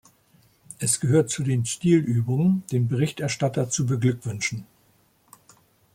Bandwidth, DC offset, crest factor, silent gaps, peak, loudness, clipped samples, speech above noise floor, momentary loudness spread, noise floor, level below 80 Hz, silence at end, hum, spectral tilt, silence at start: 15.5 kHz; under 0.1%; 18 dB; none; -8 dBFS; -24 LUFS; under 0.1%; 39 dB; 7 LU; -62 dBFS; -60 dBFS; 1.3 s; none; -5.5 dB/octave; 0.8 s